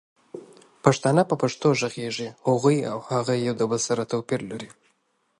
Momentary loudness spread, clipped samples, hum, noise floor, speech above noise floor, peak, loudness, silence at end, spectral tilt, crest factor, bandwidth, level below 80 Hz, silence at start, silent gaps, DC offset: 19 LU; under 0.1%; none; -70 dBFS; 46 dB; -2 dBFS; -24 LUFS; 0.7 s; -5.5 dB/octave; 22 dB; 11.5 kHz; -66 dBFS; 0.35 s; none; under 0.1%